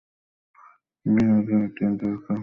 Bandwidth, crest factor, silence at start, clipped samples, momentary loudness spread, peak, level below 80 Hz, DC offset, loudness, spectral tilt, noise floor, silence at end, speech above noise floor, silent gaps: 4.2 kHz; 14 dB; 1.05 s; under 0.1%; 8 LU; -12 dBFS; -56 dBFS; under 0.1%; -23 LUFS; -10 dB/octave; -55 dBFS; 0 s; 33 dB; none